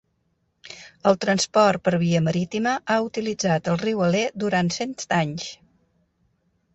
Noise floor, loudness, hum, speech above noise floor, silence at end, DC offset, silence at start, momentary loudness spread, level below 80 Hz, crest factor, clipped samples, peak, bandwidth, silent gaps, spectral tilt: -70 dBFS; -22 LUFS; none; 48 dB; 1.2 s; under 0.1%; 0.65 s; 9 LU; -60 dBFS; 18 dB; under 0.1%; -6 dBFS; 8.2 kHz; none; -5 dB/octave